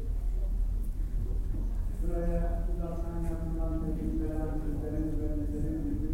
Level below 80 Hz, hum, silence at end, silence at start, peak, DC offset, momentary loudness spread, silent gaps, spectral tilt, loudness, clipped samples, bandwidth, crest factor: -32 dBFS; none; 0 s; 0 s; -18 dBFS; under 0.1%; 3 LU; none; -9 dB/octave; -35 LUFS; under 0.1%; 9.2 kHz; 12 dB